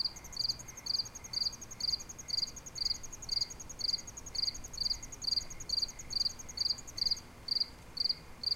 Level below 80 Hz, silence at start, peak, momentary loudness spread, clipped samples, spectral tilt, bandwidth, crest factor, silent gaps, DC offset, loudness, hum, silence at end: -54 dBFS; 0 s; -22 dBFS; 4 LU; under 0.1%; -0.5 dB/octave; 17 kHz; 16 dB; none; under 0.1%; -35 LUFS; none; 0 s